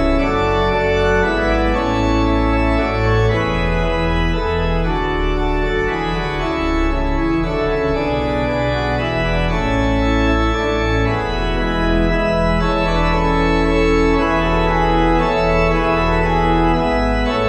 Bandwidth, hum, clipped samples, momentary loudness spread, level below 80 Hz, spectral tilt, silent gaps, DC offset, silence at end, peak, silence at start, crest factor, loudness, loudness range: 8.4 kHz; none; under 0.1%; 4 LU; -22 dBFS; -7 dB/octave; none; under 0.1%; 0 s; -2 dBFS; 0 s; 14 dB; -17 LUFS; 3 LU